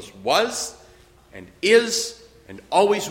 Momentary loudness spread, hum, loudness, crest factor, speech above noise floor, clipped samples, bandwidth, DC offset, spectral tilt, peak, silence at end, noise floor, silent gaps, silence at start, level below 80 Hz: 12 LU; none; -21 LUFS; 20 dB; 30 dB; under 0.1%; 16.5 kHz; under 0.1%; -2 dB/octave; -4 dBFS; 0 s; -51 dBFS; none; 0 s; -58 dBFS